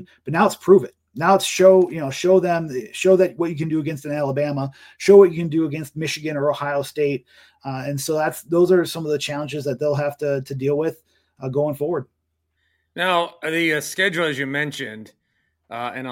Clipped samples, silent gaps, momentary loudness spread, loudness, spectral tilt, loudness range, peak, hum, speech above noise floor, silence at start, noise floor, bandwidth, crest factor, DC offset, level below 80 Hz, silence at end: under 0.1%; none; 14 LU; -20 LUFS; -5.5 dB/octave; 7 LU; -2 dBFS; none; 53 dB; 0 s; -73 dBFS; 16.5 kHz; 18 dB; under 0.1%; -62 dBFS; 0 s